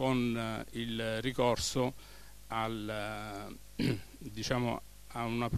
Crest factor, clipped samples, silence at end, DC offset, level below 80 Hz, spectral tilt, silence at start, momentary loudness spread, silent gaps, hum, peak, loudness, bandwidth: 20 dB; under 0.1%; 0 s; 0.2%; -54 dBFS; -5 dB/octave; 0 s; 14 LU; none; 50 Hz at -55 dBFS; -16 dBFS; -35 LUFS; 14 kHz